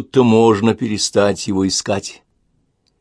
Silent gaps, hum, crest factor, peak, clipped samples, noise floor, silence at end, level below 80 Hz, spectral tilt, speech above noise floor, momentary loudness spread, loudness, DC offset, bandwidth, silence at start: none; none; 16 dB; 0 dBFS; under 0.1%; -63 dBFS; 0.9 s; -54 dBFS; -4.5 dB/octave; 48 dB; 10 LU; -16 LUFS; under 0.1%; 11 kHz; 0 s